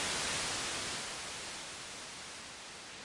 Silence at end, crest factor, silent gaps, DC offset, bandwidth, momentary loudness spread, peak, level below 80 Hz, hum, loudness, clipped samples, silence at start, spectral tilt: 0 s; 16 dB; none; under 0.1%; 11.5 kHz; 12 LU; -26 dBFS; -64 dBFS; none; -38 LUFS; under 0.1%; 0 s; -0.5 dB/octave